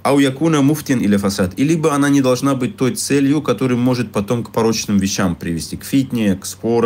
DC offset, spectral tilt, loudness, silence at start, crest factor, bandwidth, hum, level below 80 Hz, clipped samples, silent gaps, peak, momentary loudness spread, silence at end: under 0.1%; -5.5 dB/octave; -17 LUFS; 0.05 s; 12 dB; 16.5 kHz; none; -48 dBFS; under 0.1%; none; -4 dBFS; 5 LU; 0 s